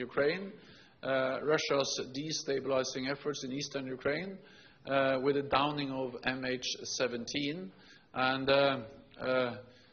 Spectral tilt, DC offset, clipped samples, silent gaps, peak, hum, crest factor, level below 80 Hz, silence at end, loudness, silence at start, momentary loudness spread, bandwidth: -2.5 dB/octave; under 0.1%; under 0.1%; none; -14 dBFS; none; 20 dB; -68 dBFS; 0.2 s; -33 LUFS; 0 s; 13 LU; 6.8 kHz